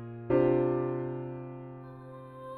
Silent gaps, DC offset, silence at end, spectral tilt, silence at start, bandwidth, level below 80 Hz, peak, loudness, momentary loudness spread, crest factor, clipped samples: none; under 0.1%; 0 s; -11 dB/octave; 0 s; 4.2 kHz; -60 dBFS; -14 dBFS; -30 LUFS; 20 LU; 18 dB; under 0.1%